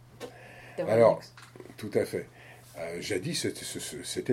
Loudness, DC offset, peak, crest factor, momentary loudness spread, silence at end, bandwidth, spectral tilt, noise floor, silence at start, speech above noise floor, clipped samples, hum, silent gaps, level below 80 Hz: -30 LUFS; under 0.1%; -10 dBFS; 22 dB; 25 LU; 0 s; 16.5 kHz; -4.5 dB/octave; -49 dBFS; 0.15 s; 20 dB; under 0.1%; none; none; -66 dBFS